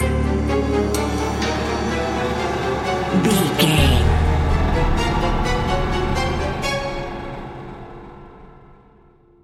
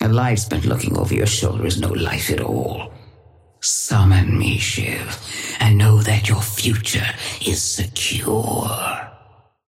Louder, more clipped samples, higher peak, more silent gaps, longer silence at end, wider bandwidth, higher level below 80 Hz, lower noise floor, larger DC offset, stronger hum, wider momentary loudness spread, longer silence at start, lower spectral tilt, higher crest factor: about the same, -20 LUFS vs -19 LUFS; neither; about the same, -2 dBFS vs -4 dBFS; neither; first, 0.85 s vs 0.55 s; about the same, 15.5 kHz vs 16.5 kHz; first, -26 dBFS vs -38 dBFS; about the same, -51 dBFS vs -51 dBFS; neither; neither; first, 16 LU vs 11 LU; about the same, 0 s vs 0 s; about the same, -5.5 dB/octave vs -4.5 dB/octave; about the same, 18 dB vs 16 dB